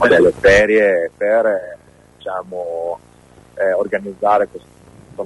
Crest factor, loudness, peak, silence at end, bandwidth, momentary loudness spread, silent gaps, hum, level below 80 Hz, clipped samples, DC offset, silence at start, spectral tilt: 14 dB; -16 LUFS; -2 dBFS; 0 s; 11.5 kHz; 16 LU; none; none; -42 dBFS; under 0.1%; under 0.1%; 0 s; -5 dB/octave